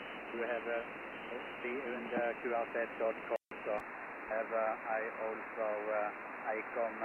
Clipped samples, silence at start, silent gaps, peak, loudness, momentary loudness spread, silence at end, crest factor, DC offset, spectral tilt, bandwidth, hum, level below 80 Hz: under 0.1%; 0 s; none; -24 dBFS; -39 LUFS; 7 LU; 0 s; 16 dB; under 0.1%; -6 dB/octave; 8.2 kHz; none; -74 dBFS